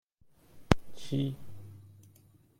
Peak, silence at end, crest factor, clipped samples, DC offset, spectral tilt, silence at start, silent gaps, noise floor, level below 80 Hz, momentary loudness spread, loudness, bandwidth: -2 dBFS; 0.5 s; 32 dB; under 0.1%; under 0.1%; -6.5 dB/octave; 0.55 s; none; -63 dBFS; -48 dBFS; 22 LU; -33 LUFS; 16.5 kHz